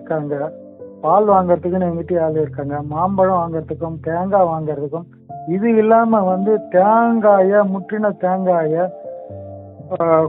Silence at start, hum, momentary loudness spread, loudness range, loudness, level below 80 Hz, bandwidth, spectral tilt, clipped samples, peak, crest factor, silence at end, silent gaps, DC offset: 0 s; none; 19 LU; 4 LU; -17 LUFS; -54 dBFS; 3.8 kHz; -9 dB/octave; under 0.1%; -2 dBFS; 16 dB; 0 s; none; under 0.1%